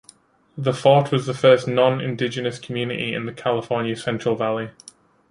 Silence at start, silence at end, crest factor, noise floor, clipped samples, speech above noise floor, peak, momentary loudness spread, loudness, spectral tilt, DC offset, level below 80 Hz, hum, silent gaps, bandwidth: 0.55 s; 0.6 s; 20 dB; -53 dBFS; under 0.1%; 32 dB; -2 dBFS; 11 LU; -21 LUFS; -6 dB/octave; under 0.1%; -62 dBFS; none; none; 11 kHz